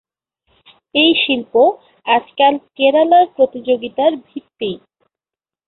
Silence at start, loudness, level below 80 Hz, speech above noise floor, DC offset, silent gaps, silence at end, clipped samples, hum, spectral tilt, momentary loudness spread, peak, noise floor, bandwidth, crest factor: 0.95 s; -15 LUFS; -62 dBFS; 76 dB; under 0.1%; none; 0.9 s; under 0.1%; none; -8.5 dB/octave; 13 LU; -2 dBFS; -90 dBFS; 4.3 kHz; 16 dB